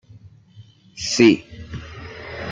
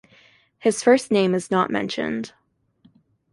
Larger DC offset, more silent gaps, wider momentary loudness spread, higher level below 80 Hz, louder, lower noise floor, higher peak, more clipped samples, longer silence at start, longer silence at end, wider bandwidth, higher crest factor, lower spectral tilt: neither; neither; first, 21 LU vs 11 LU; first, -48 dBFS vs -64 dBFS; first, -18 LUFS vs -21 LUFS; second, -47 dBFS vs -60 dBFS; about the same, -2 dBFS vs -4 dBFS; neither; about the same, 0.6 s vs 0.65 s; second, 0 s vs 1.05 s; second, 9.2 kHz vs 11.5 kHz; about the same, 22 dB vs 20 dB; about the same, -4.5 dB/octave vs -5 dB/octave